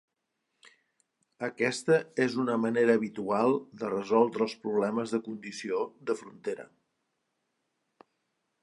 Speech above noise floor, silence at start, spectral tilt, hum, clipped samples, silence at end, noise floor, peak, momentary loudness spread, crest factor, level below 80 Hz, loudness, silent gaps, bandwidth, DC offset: 53 dB; 1.4 s; -5.5 dB/octave; none; under 0.1%; 2 s; -82 dBFS; -10 dBFS; 12 LU; 20 dB; -80 dBFS; -30 LUFS; none; 11.5 kHz; under 0.1%